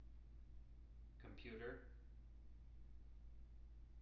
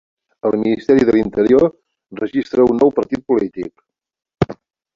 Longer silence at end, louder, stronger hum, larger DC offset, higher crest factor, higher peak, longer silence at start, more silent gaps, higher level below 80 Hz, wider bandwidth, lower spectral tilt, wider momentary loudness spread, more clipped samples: second, 0 s vs 0.4 s; second, -61 LUFS vs -16 LUFS; neither; neither; about the same, 18 dB vs 16 dB; second, -40 dBFS vs 0 dBFS; second, 0 s vs 0.45 s; neither; second, -60 dBFS vs -46 dBFS; second, 5.8 kHz vs 7.4 kHz; second, -5.5 dB/octave vs -8 dB/octave; about the same, 11 LU vs 12 LU; neither